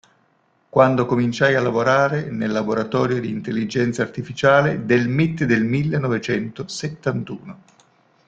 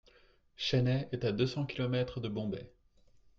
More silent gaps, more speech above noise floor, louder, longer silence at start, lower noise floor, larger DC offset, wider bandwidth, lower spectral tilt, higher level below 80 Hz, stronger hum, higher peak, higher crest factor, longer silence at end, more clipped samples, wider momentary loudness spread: neither; first, 43 dB vs 32 dB; first, -20 LUFS vs -34 LUFS; first, 0.75 s vs 0.6 s; about the same, -62 dBFS vs -65 dBFS; neither; first, 9 kHz vs 7.2 kHz; about the same, -6.5 dB/octave vs -7 dB/octave; about the same, -56 dBFS vs -60 dBFS; neither; first, -2 dBFS vs -18 dBFS; about the same, 18 dB vs 18 dB; about the same, 0.7 s vs 0.7 s; neither; about the same, 9 LU vs 7 LU